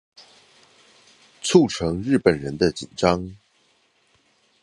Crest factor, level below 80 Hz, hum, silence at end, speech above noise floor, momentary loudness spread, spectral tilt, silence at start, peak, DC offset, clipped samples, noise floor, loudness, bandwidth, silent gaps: 22 dB; -48 dBFS; none; 1.25 s; 43 dB; 9 LU; -5.5 dB/octave; 1.45 s; -2 dBFS; under 0.1%; under 0.1%; -63 dBFS; -21 LUFS; 11.5 kHz; none